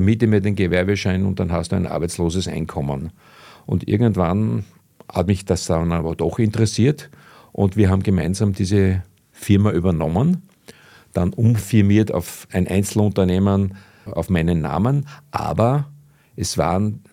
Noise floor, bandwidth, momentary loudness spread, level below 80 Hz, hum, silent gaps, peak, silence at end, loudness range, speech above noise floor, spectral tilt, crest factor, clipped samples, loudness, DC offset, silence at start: -46 dBFS; 15.5 kHz; 10 LU; -40 dBFS; none; none; -2 dBFS; 0.15 s; 3 LU; 28 dB; -7 dB/octave; 18 dB; under 0.1%; -20 LUFS; under 0.1%; 0 s